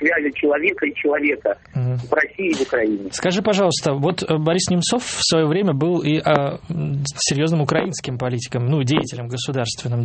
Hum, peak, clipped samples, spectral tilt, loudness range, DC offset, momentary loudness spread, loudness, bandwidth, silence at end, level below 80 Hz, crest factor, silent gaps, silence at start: none; -2 dBFS; under 0.1%; -5 dB/octave; 2 LU; under 0.1%; 7 LU; -20 LUFS; 8.8 kHz; 0 s; -52 dBFS; 18 dB; none; 0 s